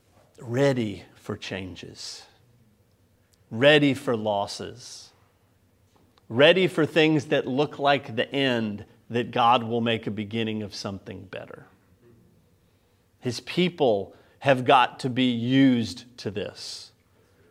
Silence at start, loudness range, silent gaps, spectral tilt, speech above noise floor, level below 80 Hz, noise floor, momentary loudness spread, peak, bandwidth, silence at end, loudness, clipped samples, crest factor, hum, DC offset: 0.4 s; 8 LU; none; -5.5 dB/octave; 39 dB; -68 dBFS; -64 dBFS; 20 LU; -4 dBFS; 13.5 kHz; 0.65 s; -24 LUFS; under 0.1%; 22 dB; none; under 0.1%